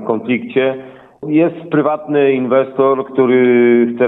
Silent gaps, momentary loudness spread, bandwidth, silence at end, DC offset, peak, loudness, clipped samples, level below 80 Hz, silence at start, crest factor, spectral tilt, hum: none; 7 LU; 4 kHz; 0 s; under 0.1%; -2 dBFS; -14 LUFS; under 0.1%; -64 dBFS; 0 s; 12 dB; -10 dB/octave; none